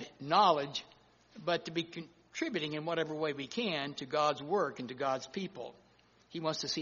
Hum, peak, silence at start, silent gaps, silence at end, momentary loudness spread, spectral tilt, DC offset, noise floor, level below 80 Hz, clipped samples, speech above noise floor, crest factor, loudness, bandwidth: none; -14 dBFS; 0 s; none; 0 s; 15 LU; -2.5 dB/octave; under 0.1%; -65 dBFS; -76 dBFS; under 0.1%; 31 dB; 20 dB; -34 LUFS; 7.2 kHz